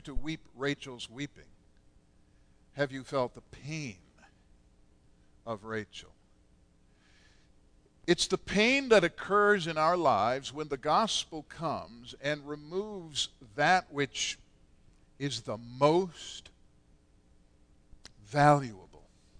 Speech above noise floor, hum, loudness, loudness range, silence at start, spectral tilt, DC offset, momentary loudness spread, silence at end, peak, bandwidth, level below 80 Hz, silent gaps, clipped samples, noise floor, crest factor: 33 dB; none; -30 LUFS; 16 LU; 0.05 s; -4 dB/octave; under 0.1%; 17 LU; 0.4 s; -10 dBFS; 11 kHz; -54 dBFS; none; under 0.1%; -64 dBFS; 22 dB